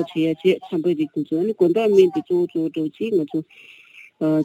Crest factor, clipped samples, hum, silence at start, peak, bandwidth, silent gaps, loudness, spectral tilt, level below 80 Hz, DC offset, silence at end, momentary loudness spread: 16 dB; under 0.1%; none; 0 s; -4 dBFS; 12 kHz; none; -21 LUFS; -7.5 dB/octave; -72 dBFS; under 0.1%; 0 s; 10 LU